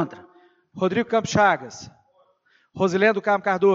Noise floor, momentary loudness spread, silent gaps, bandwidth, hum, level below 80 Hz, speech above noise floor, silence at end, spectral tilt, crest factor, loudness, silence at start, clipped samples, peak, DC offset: -63 dBFS; 11 LU; none; 7.8 kHz; none; -60 dBFS; 43 dB; 0 s; -5.5 dB/octave; 18 dB; -21 LUFS; 0 s; under 0.1%; -4 dBFS; under 0.1%